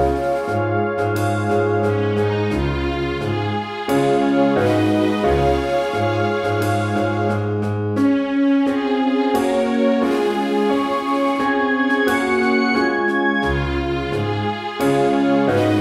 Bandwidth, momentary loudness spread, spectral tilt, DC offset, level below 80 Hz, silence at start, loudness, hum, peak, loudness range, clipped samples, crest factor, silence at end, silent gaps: 15 kHz; 5 LU; -6.5 dB/octave; under 0.1%; -36 dBFS; 0 s; -19 LUFS; none; -4 dBFS; 2 LU; under 0.1%; 14 dB; 0 s; none